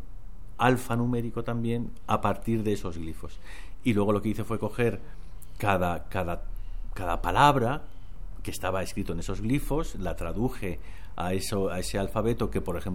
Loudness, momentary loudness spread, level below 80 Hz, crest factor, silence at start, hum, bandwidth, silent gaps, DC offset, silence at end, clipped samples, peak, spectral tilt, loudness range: -29 LUFS; 18 LU; -38 dBFS; 24 dB; 0 s; none; 17 kHz; none; 2%; 0 s; under 0.1%; -6 dBFS; -6 dB/octave; 4 LU